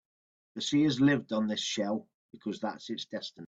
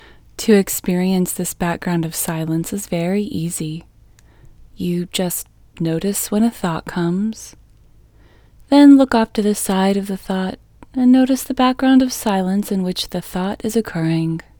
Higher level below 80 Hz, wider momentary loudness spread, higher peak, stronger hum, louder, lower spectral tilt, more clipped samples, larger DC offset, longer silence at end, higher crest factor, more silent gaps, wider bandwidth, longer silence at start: second, -70 dBFS vs -46 dBFS; about the same, 14 LU vs 12 LU; second, -14 dBFS vs 0 dBFS; neither; second, -31 LUFS vs -18 LUFS; about the same, -5 dB/octave vs -5.5 dB/octave; neither; neither; second, 0 s vs 0.2 s; about the same, 18 dB vs 18 dB; first, 2.14-2.29 s vs none; second, 8 kHz vs over 20 kHz; first, 0.55 s vs 0.4 s